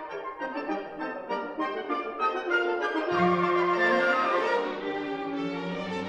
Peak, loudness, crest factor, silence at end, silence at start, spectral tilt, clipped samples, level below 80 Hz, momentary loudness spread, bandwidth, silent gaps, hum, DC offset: -14 dBFS; -28 LUFS; 16 dB; 0 s; 0 s; -6 dB/octave; under 0.1%; -68 dBFS; 10 LU; 9 kHz; none; none; under 0.1%